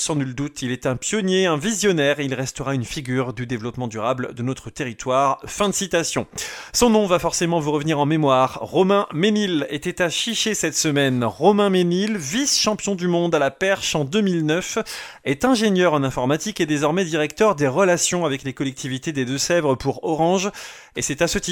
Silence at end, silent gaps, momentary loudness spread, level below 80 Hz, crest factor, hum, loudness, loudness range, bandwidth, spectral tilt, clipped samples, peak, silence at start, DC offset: 0 s; none; 9 LU; -48 dBFS; 18 dB; none; -21 LUFS; 4 LU; 18.5 kHz; -4 dB/octave; under 0.1%; -2 dBFS; 0 s; under 0.1%